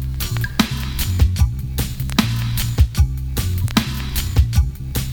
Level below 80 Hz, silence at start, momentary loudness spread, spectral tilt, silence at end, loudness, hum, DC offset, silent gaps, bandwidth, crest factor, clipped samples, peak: -22 dBFS; 0 s; 6 LU; -5 dB/octave; 0 s; -20 LUFS; none; under 0.1%; none; 20 kHz; 18 dB; under 0.1%; 0 dBFS